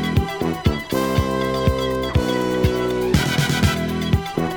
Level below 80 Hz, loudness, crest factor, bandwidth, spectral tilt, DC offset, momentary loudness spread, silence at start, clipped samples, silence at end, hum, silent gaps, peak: -32 dBFS; -20 LUFS; 18 dB; over 20 kHz; -5.5 dB/octave; under 0.1%; 4 LU; 0 s; under 0.1%; 0 s; none; none; -2 dBFS